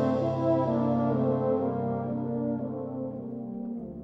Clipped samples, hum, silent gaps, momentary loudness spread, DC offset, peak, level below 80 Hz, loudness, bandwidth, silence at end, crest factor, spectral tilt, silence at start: under 0.1%; none; none; 10 LU; under 0.1%; -14 dBFS; -62 dBFS; -29 LUFS; 6 kHz; 0 s; 14 dB; -10.5 dB/octave; 0 s